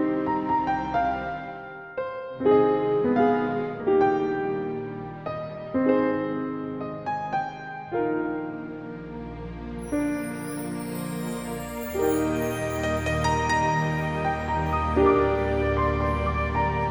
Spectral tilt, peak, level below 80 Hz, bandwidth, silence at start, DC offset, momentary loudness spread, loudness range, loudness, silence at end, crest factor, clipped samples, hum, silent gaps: -6.5 dB/octave; -8 dBFS; -40 dBFS; over 20 kHz; 0 s; under 0.1%; 13 LU; 7 LU; -26 LUFS; 0 s; 18 dB; under 0.1%; none; none